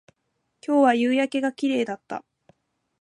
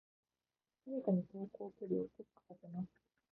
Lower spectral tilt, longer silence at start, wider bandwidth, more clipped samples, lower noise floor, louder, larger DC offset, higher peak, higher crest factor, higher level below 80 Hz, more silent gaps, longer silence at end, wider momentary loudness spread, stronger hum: second, -4.5 dB/octave vs -13 dB/octave; second, 0.7 s vs 0.85 s; first, 11 kHz vs 2 kHz; neither; second, -75 dBFS vs under -90 dBFS; first, -23 LUFS vs -43 LUFS; neither; first, -6 dBFS vs -24 dBFS; about the same, 18 dB vs 20 dB; about the same, -78 dBFS vs -82 dBFS; neither; first, 0.8 s vs 0.5 s; second, 17 LU vs 22 LU; neither